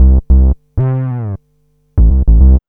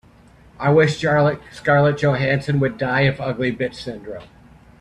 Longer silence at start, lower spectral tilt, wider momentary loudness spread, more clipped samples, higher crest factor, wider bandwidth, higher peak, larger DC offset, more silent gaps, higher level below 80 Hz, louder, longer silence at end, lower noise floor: second, 0 s vs 0.6 s; first, -13.5 dB/octave vs -7 dB/octave; second, 12 LU vs 15 LU; first, 0.2% vs under 0.1%; second, 10 dB vs 18 dB; second, 1.9 kHz vs 9.8 kHz; about the same, 0 dBFS vs -2 dBFS; neither; neither; first, -10 dBFS vs -48 dBFS; first, -13 LUFS vs -19 LUFS; second, 0.1 s vs 0.55 s; first, -56 dBFS vs -49 dBFS